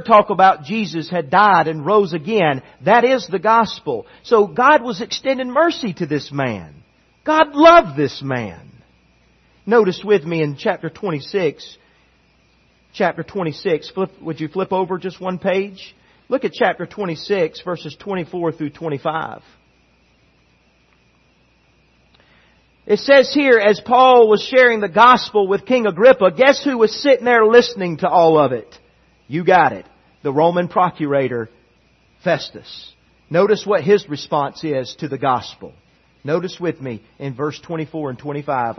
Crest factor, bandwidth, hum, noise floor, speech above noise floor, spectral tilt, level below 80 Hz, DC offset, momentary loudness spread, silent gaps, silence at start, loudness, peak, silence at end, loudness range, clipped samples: 18 dB; 6.4 kHz; none; -57 dBFS; 41 dB; -6 dB/octave; -58 dBFS; under 0.1%; 15 LU; none; 0 s; -16 LUFS; 0 dBFS; 0.05 s; 12 LU; under 0.1%